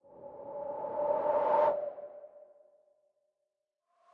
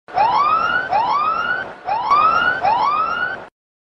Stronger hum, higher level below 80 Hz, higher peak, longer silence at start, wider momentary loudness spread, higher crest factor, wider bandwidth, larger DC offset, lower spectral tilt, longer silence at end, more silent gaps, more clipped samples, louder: neither; second, -78 dBFS vs -52 dBFS; second, -16 dBFS vs -4 dBFS; about the same, 0.1 s vs 0.1 s; first, 21 LU vs 9 LU; about the same, 18 dB vs 14 dB; second, 4.6 kHz vs 7.8 kHz; neither; first, -7.5 dB/octave vs -4 dB/octave; first, 1.7 s vs 0.45 s; neither; neither; second, -32 LUFS vs -17 LUFS